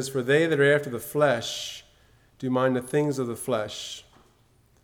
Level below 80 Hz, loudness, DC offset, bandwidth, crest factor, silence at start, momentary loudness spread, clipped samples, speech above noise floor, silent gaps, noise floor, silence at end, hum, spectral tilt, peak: -64 dBFS; -25 LUFS; under 0.1%; 19.5 kHz; 18 dB; 0 s; 15 LU; under 0.1%; 36 dB; none; -61 dBFS; 0.85 s; none; -5 dB/octave; -8 dBFS